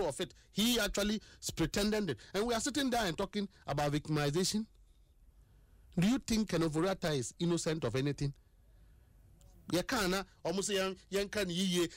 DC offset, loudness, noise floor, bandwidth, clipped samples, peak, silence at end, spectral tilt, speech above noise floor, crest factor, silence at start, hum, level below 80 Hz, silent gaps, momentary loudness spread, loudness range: under 0.1%; -34 LUFS; -63 dBFS; 16 kHz; under 0.1%; -22 dBFS; 0 s; -4.5 dB/octave; 29 dB; 12 dB; 0 s; none; -54 dBFS; none; 7 LU; 3 LU